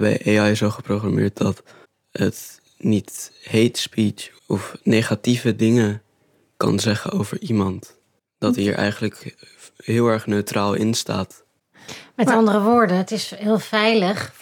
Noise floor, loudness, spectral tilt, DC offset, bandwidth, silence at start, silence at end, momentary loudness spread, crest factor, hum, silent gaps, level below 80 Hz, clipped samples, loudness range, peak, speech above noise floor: -62 dBFS; -20 LUFS; -5.5 dB/octave; under 0.1%; 17.5 kHz; 0 s; 0.1 s; 17 LU; 18 dB; none; none; -62 dBFS; under 0.1%; 4 LU; -2 dBFS; 42 dB